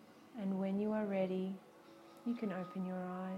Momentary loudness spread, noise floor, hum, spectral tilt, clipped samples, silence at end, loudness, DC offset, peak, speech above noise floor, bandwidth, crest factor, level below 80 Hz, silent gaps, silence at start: 17 LU; -59 dBFS; none; -8.5 dB/octave; under 0.1%; 0 s; -40 LUFS; under 0.1%; -24 dBFS; 20 dB; 8 kHz; 16 dB; -82 dBFS; none; 0 s